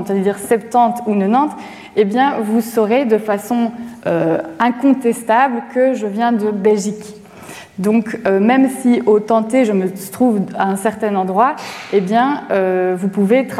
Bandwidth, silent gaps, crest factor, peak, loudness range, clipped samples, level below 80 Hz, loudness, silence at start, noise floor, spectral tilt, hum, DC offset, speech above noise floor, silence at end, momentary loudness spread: 15 kHz; none; 14 dB; 0 dBFS; 2 LU; under 0.1%; -62 dBFS; -16 LUFS; 0 s; -36 dBFS; -6 dB/octave; none; under 0.1%; 20 dB; 0 s; 7 LU